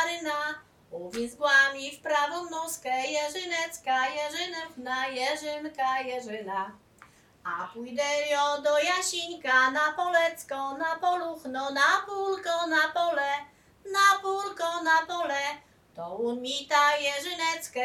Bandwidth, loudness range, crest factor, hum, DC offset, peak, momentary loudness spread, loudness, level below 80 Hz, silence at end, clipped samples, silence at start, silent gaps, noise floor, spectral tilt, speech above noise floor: 17.5 kHz; 5 LU; 20 dB; none; under 0.1%; -8 dBFS; 12 LU; -27 LUFS; -72 dBFS; 0 s; under 0.1%; 0 s; none; -57 dBFS; -1 dB/octave; 29 dB